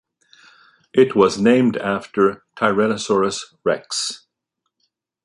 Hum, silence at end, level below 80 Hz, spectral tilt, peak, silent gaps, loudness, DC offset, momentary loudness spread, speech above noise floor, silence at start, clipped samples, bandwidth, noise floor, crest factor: none; 1.1 s; -58 dBFS; -4.5 dB/octave; 0 dBFS; none; -19 LUFS; under 0.1%; 8 LU; 60 dB; 0.95 s; under 0.1%; 11.5 kHz; -77 dBFS; 20 dB